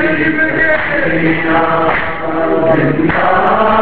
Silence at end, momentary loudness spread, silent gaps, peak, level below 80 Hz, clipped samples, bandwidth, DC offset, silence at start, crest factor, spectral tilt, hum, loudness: 0 s; 3 LU; none; 0 dBFS; -36 dBFS; under 0.1%; 4.8 kHz; 6%; 0 s; 12 dB; -9.5 dB/octave; none; -12 LUFS